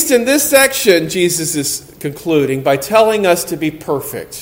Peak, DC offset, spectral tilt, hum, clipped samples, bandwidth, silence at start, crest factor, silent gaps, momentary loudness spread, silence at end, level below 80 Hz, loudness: 0 dBFS; under 0.1%; -3.5 dB/octave; none; 0.1%; 17 kHz; 0 s; 14 dB; none; 11 LU; 0 s; -50 dBFS; -13 LUFS